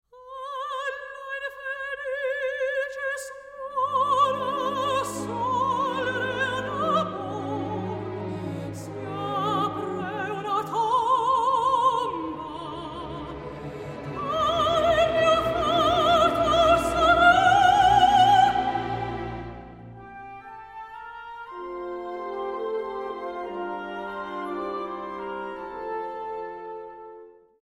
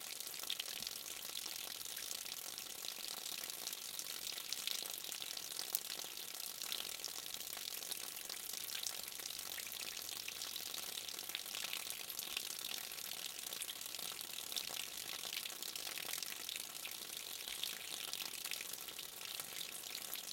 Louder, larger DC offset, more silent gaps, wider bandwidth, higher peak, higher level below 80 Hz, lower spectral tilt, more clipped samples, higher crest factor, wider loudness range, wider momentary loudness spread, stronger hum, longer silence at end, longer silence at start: first, -25 LUFS vs -43 LUFS; neither; neither; about the same, 16 kHz vs 17 kHz; first, -6 dBFS vs -10 dBFS; first, -50 dBFS vs -82 dBFS; first, -4.5 dB/octave vs 1.5 dB/octave; neither; second, 20 dB vs 36 dB; first, 14 LU vs 1 LU; first, 20 LU vs 3 LU; neither; first, 0.3 s vs 0 s; first, 0.15 s vs 0 s